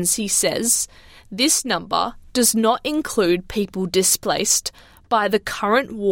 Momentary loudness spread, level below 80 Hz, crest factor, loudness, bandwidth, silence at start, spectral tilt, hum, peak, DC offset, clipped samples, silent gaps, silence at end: 6 LU; -48 dBFS; 18 dB; -19 LUFS; 17 kHz; 0 s; -2 dB/octave; none; -2 dBFS; under 0.1%; under 0.1%; none; 0 s